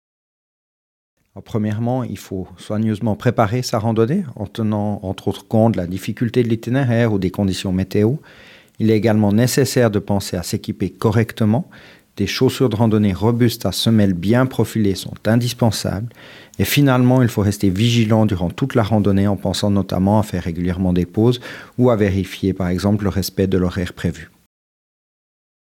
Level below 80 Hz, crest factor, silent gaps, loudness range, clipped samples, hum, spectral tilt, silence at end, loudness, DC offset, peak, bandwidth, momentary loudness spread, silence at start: -50 dBFS; 18 dB; none; 3 LU; under 0.1%; none; -6.5 dB/octave; 1.35 s; -18 LUFS; under 0.1%; 0 dBFS; 17 kHz; 9 LU; 1.35 s